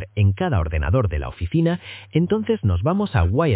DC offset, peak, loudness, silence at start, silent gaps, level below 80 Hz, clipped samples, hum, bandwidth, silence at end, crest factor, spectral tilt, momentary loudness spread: under 0.1%; -4 dBFS; -21 LUFS; 0 s; none; -30 dBFS; under 0.1%; none; 4 kHz; 0 s; 16 dB; -12 dB/octave; 5 LU